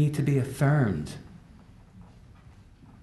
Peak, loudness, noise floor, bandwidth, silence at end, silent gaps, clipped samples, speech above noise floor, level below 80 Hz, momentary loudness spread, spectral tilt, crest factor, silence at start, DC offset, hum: -12 dBFS; -26 LUFS; -52 dBFS; 12 kHz; 0.95 s; none; under 0.1%; 27 dB; -52 dBFS; 20 LU; -7.5 dB/octave; 16 dB; 0 s; under 0.1%; none